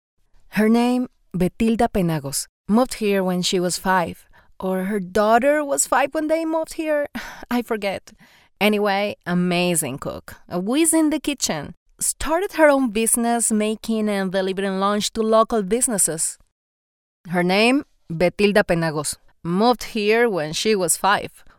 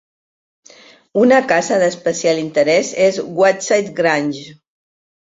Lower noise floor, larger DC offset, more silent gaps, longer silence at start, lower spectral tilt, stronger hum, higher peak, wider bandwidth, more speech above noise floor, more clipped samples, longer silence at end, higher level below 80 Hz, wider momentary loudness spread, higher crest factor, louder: first, under -90 dBFS vs -45 dBFS; neither; first, 2.49-2.64 s, 11.77-11.86 s, 16.52-17.24 s vs none; second, 0.5 s vs 1.15 s; about the same, -4 dB/octave vs -4 dB/octave; neither; about the same, -4 dBFS vs -2 dBFS; first, 18.5 kHz vs 7.8 kHz; first, over 70 dB vs 30 dB; neither; second, 0.1 s vs 0.75 s; first, -46 dBFS vs -60 dBFS; first, 9 LU vs 6 LU; about the same, 18 dB vs 16 dB; second, -20 LUFS vs -15 LUFS